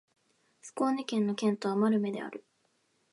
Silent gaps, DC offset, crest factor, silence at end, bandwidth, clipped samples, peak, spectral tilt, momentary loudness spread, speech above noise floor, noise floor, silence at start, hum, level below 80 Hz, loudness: none; under 0.1%; 16 dB; 0.7 s; 11.5 kHz; under 0.1%; -16 dBFS; -6 dB/octave; 16 LU; 43 dB; -73 dBFS; 0.65 s; none; -82 dBFS; -31 LUFS